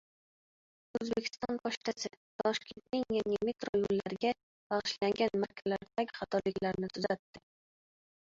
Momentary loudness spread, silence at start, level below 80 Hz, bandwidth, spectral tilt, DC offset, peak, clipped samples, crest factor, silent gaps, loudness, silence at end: 7 LU; 0.95 s; -68 dBFS; 7.6 kHz; -3.5 dB/octave; under 0.1%; -16 dBFS; under 0.1%; 20 dB; 1.77-1.81 s, 2.17-2.39 s, 3.69-3.73 s, 4.43-4.70 s, 7.19-7.34 s; -35 LUFS; 1 s